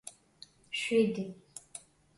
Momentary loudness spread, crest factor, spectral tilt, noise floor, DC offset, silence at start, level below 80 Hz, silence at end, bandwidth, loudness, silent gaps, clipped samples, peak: 26 LU; 20 dB; -4.5 dB/octave; -59 dBFS; under 0.1%; 0.05 s; -74 dBFS; 0.4 s; 11.5 kHz; -32 LUFS; none; under 0.1%; -14 dBFS